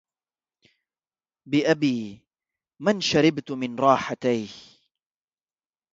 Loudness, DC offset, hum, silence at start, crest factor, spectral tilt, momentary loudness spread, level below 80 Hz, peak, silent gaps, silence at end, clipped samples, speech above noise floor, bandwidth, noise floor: -23 LUFS; under 0.1%; none; 1.45 s; 22 dB; -5 dB/octave; 11 LU; -64 dBFS; -4 dBFS; none; 1.35 s; under 0.1%; over 67 dB; 7.8 kHz; under -90 dBFS